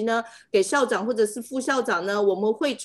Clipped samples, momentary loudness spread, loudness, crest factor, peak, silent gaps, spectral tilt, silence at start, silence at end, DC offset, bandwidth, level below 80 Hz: under 0.1%; 4 LU; -24 LUFS; 16 dB; -8 dBFS; none; -3.5 dB/octave; 0 s; 0 s; under 0.1%; 12.5 kHz; -72 dBFS